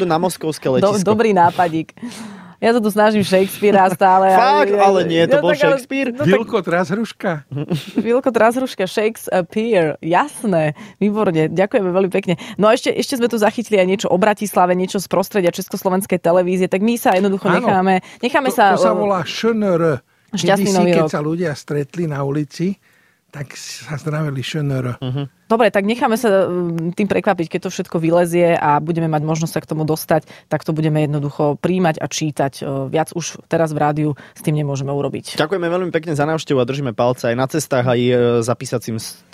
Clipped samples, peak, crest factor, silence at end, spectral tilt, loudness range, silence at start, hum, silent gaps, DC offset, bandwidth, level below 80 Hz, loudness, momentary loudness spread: under 0.1%; -2 dBFS; 14 dB; 0.2 s; -6 dB/octave; 6 LU; 0 s; none; none; under 0.1%; 16 kHz; -56 dBFS; -17 LUFS; 9 LU